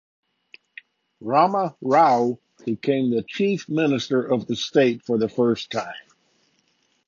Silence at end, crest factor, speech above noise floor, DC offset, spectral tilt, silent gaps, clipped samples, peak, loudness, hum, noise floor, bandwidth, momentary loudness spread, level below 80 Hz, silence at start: 1.05 s; 18 dB; 46 dB; under 0.1%; -6 dB/octave; none; under 0.1%; -4 dBFS; -22 LUFS; none; -67 dBFS; 7.4 kHz; 11 LU; -66 dBFS; 1.2 s